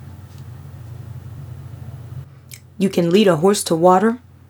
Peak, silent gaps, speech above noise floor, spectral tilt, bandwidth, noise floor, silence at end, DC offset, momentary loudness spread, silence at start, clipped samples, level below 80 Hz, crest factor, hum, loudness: 0 dBFS; none; 26 dB; -5.5 dB/octave; over 20 kHz; -41 dBFS; 0.3 s; under 0.1%; 24 LU; 0 s; under 0.1%; -54 dBFS; 20 dB; none; -16 LUFS